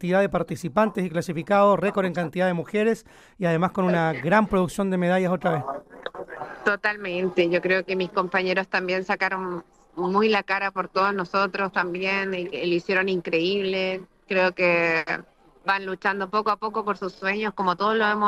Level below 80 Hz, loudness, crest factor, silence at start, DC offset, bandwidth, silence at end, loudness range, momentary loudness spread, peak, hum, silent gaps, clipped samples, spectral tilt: -56 dBFS; -24 LUFS; 18 dB; 0 s; under 0.1%; 14.5 kHz; 0 s; 2 LU; 8 LU; -6 dBFS; none; none; under 0.1%; -6 dB/octave